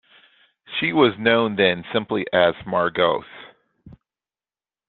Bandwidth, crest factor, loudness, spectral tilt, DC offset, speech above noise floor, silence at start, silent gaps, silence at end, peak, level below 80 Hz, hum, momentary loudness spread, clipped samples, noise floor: 4.5 kHz; 20 dB; -20 LUFS; -8.5 dB/octave; under 0.1%; over 70 dB; 0.7 s; none; 1 s; -2 dBFS; -60 dBFS; none; 8 LU; under 0.1%; under -90 dBFS